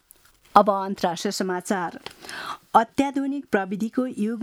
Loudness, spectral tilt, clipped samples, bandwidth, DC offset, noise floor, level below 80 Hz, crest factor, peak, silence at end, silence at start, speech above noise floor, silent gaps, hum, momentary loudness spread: -24 LUFS; -5 dB/octave; under 0.1%; 17 kHz; under 0.1%; -56 dBFS; -64 dBFS; 24 dB; 0 dBFS; 0 s; 0.55 s; 32 dB; none; none; 15 LU